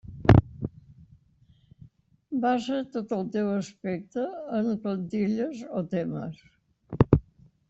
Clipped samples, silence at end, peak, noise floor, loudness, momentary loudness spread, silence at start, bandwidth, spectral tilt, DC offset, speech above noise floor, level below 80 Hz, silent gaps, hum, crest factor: under 0.1%; 0.5 s; -2 dBFS; -61 dBFS; -27 LUFS; 14 LU; 0.05 s; 8 kHz; -8.5 dB/octave; under 0.1%; 32 dB; -44 dBFS; none; none; 26 dB